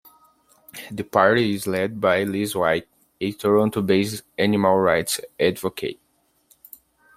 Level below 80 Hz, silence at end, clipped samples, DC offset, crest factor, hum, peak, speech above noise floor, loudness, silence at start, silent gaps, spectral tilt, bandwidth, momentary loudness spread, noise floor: -60 dBFS; 1.25 s; under 0.1%; under 0.1%; 20 dB; none; -2 dBFS; 40 dB; -21 LUFS; 0.75 s; none; -5 dB/octave; 16 kHz; 13 LU; -61 dBFS